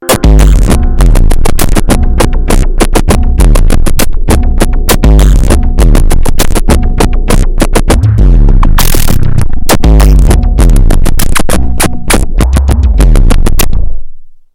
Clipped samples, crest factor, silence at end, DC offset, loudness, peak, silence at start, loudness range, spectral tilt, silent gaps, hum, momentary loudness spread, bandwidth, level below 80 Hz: 2%; 4 dB; 0.25 s; under 0.1%; -9 LUFS; 0 dBFS; 0 s; 2 LU; -5 dB/octave; none; none; 5 LU; 17.5 kHz; -4 dBFS